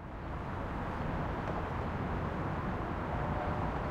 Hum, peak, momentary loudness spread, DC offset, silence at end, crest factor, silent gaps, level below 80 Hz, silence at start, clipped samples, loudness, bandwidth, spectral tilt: none; -22 dBFS; 4 LU; under 0.1%; 0 s; 14 dB; none; -44 dBFS; 0 s; under 0.1%; -37 LUFS; 9.8 kHz; -8 dB/octave